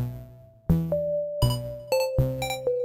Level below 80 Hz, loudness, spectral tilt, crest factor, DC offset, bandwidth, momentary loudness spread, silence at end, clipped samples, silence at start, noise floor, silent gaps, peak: -38 dBFS; -27 LUFS; -6 dB/octave; 16 dB; under 0.1%; 16.5 kHz; 9 LU; 0 s; under 0.1%; 0 s; -47 dBFS; none; -10 dBFS